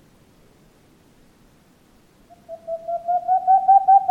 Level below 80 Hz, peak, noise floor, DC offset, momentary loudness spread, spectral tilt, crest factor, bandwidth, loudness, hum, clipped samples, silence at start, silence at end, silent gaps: -62 dBFS; -6 dBFS; -55 dBFS; under 0.1%; 22 LU; -5.5 dB/octave; 16 dB; 2.5 kHz; -18 LUFS; none; under 0.1%; 2.5 s; 0 s; none